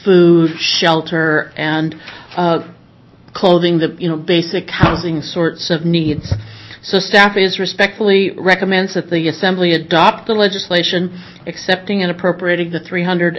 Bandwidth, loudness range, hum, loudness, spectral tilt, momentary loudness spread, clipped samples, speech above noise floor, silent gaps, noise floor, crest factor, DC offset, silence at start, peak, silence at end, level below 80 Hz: 8 kHz; 3 LU; none; -14 LUFS; -5.5 dB/octave; 10 LU; under 0.1%; 29 dB; none; -44 dBFS; 14 dB; under 0.1%; 0 s; 0 dBFS; 0 s; -40 dBFS